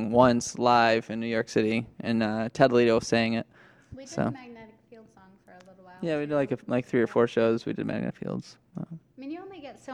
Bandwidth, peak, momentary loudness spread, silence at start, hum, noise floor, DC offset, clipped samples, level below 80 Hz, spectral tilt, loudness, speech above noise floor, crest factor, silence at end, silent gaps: 11 kHz; -4 dBFS; 20 LU; 0 s; none; -55 dBFS; under 0.1%; under 0.1%; -60 dBFS; -5.5 dB/octave; -26 LUFS; 29 dB; 22 dB; 0 s; none